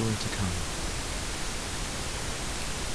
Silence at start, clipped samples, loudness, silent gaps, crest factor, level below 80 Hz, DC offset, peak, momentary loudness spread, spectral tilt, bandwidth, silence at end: 0 s; under 0.1%; -32 LUFS; none; 16 dB; -38 dBFS; under 0.1%; -16 dBFS; 3 LU; -3 dB/octave; 11 kHz; 0 s